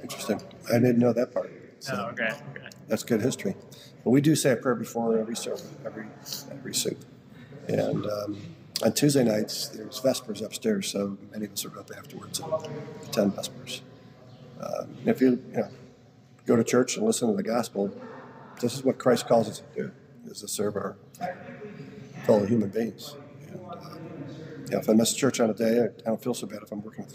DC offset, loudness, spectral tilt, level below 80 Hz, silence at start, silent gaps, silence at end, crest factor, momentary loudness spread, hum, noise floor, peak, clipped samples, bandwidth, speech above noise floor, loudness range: under 0.1%; -27 LUFS; -5 dB/octave; -72 dBFS; 0 s; none; 0 s; 20 dB; 19 LU; none; -54 dBFS; -8 dBFS; under 0.1%; 16 kHz; 27 dB; 5 LU